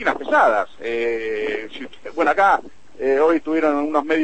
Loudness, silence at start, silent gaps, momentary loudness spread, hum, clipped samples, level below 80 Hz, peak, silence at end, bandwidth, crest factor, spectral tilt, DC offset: -19 LUFS; 0 s; none; 11 LU; none; under 0.1%; -54 dBFS; -4 dBFS; 0 s; 8.8 kHz; 16 dB; -4.5 dB/octave; 1%